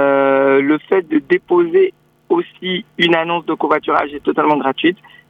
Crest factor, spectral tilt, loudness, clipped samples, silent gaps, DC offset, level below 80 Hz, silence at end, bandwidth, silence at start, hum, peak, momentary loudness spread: 14 dB; -7 dB/octave; -15 LUFS; under 0.1%; none; under 0.1%; -60 dBFS; 0.35 s; 5.4 kHz; 0 s; none; 0 dBFS; 6 LU